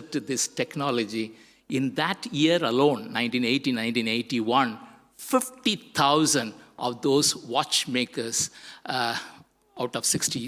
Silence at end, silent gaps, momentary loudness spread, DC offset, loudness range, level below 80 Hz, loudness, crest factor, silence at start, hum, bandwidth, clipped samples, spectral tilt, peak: 0 s; none; 11 LU; under 0.1%; 2 LU; -68 dBFS; -25 LUFS; 18 dB; 0 s; none; 16 kHz; under 0.1%; -3 dB/octave; -8 dBFS